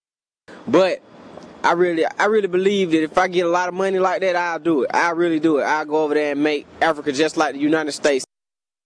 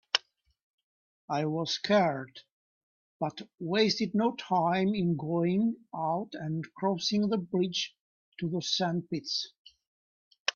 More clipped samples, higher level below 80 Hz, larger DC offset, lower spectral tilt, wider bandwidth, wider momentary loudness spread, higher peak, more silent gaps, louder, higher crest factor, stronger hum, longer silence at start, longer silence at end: neither; first, -64 dBFS vs -72 dBFS; neither; about the same, -4.5 dB/octave vs -5 dB/octave; first, 10.5 kHz vs 7.2 kHz; second, 3 LU vs 10 LU; about the same, -4 dBFS vs -6 dBFS; second, none vs 0.63-1.28 s, 2.52-3.20 s, 8.00-8.32 s, 9.59-9.65 s, 9.87-10.31 s, 10.40-10.45 s; first, -19 LUFS vs -30 LUFS; second, 14 dB vs 26 dB; neither; first, 0.5 s vs 0.15 s; first, 0.6 s vs 0.05 s